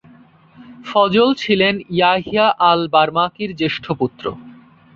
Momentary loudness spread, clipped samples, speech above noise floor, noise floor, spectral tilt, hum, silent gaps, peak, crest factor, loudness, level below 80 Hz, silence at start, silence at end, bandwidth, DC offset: 10 LU; under 0.1%; 31 dB; -47 dBFS; -6 dB/octave; none; none; -2 dBFS; 16 dB; -16 LUFS; -54 dBFS; 0.6 s; 0.45 s; 7.6 kHz; under 0.1%